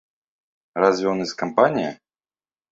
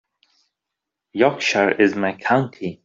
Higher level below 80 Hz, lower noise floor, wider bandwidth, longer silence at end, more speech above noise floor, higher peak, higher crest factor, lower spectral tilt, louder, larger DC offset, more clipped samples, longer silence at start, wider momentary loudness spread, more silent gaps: about the same, -64 dBFS vs -64 dBFS; first, under -90 dBFS vs -83 dBFS; about the same, 7.8 kHz vs 7.8 kHz; first, 0.8 s vs 0.1 s; first, over 70 dB vs 64 dB; about the same, -2 dBFS vs -2 dBFS; about the same, 22 dB vs 18 dB; about the same, -5.5 dB/octave vs -5 dB/octave; about the same, -21 LUFS vs -19 LUFS; neither; neither; second, 0.75 s vs 1.15 s; about the same, 10 LU vs 8 LU; neither